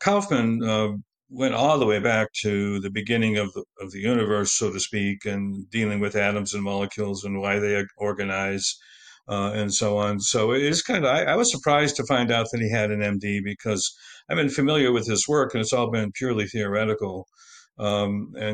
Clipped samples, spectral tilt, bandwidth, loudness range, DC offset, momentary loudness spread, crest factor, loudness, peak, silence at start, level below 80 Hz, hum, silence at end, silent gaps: under 0.1%; -4 dB/octave; 9.8 kHz; 4 LU; under 0.1%; 8 LU; 18 dB; -24 LUFS; -6 dBFS; 0 s; -60 dBFS; none; 0 s; none